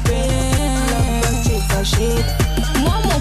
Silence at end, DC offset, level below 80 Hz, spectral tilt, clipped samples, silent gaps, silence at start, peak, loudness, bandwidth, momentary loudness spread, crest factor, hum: 0 s; under 0.1%; -20 dBFS; -4.5 dB/octave; under 0.1%; none; 0 s; -6 dBFS; -18 LUFS; 14.5 kHz; 1 LU; 10 dB; none